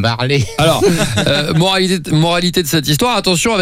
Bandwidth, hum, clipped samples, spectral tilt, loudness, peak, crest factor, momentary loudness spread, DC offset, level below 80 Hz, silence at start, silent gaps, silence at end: 16.5 kHz; none; under 0.1%; -4.5 dB/octave; -13 LUFS; -2 dBFS; 12 dB; 2 LU; under 0.1%; -36 dBFS; 0 s; none; 0 s